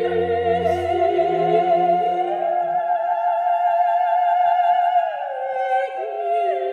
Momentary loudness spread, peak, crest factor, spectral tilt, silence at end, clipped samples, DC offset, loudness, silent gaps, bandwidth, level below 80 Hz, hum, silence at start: 5 LU; -6 dBFS; 12 dB; -7 dB/octave; 0 s; under 0.1%; under 0.1%; -20 LUFS; none; 5.4 kHz; -56 dBFS; none; 0 s